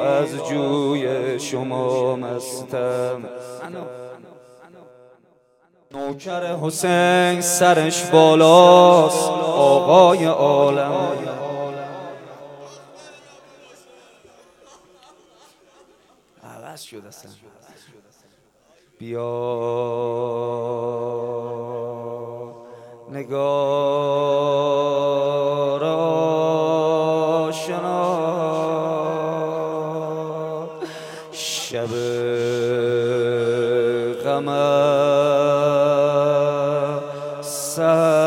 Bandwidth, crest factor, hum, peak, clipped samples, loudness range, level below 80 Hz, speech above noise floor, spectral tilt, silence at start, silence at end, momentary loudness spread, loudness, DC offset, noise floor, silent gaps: 16.5 kHz; 20 dB; none; 0 dBFS; under 0.1%; 16 LU; -70 dBFS; 42 dB; -4.5 dB/octave; 0 s; 0 s; 17 LU; -19 LUFS; under 0.1%; -59 dBFS; none